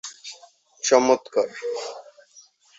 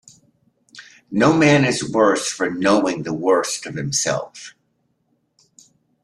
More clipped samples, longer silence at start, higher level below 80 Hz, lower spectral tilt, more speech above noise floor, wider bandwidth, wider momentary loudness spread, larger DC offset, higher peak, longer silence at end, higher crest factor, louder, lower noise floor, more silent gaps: neither; second, 0.05 s vs 0.75 s; second, -72 dBFS vs -58 dBFS; second, -2 dB/octave vs -4.5 dB/octave; second, 33 dB vs 50 dB; second, 8 kHz vs 13 kHz; first, 21 LU vs 12 LU; neither; about the same, -2 dBFS vs -2 dBFS; second, 0.75 s vs 1.55 s; about the same, 22 dB vs 18 dB; second, -22 LUFS vs -18 LUFS; second, -54 dBFS vs -68 dBFS; neither